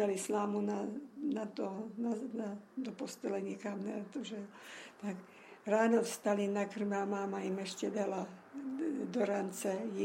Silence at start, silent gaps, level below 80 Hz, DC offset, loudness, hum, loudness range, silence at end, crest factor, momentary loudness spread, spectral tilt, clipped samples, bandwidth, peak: 0 s; none; -84 dBFS; under 0.1%; -38 LUFS; none; 6 LU; 0 s; 18 dB; 11 LU; -5.5 dB/octave; under 0.1%; 16 kHz; -18 dBFS